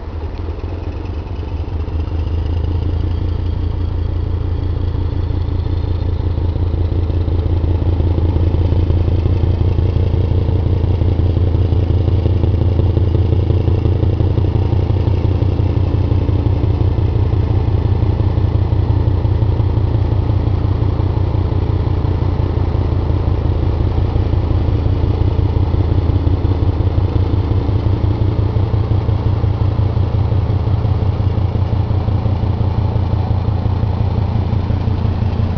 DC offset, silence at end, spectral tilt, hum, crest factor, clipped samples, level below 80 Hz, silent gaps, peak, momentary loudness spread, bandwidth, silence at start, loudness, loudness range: under 0.1%; 0 s; -10 dB/octave; none; 14 dB; under 0.1%; -20 dBFS; none; 0 dBFS; 4 LU; 5.4 kHz; 0 s; -17 LUFS; 4 LU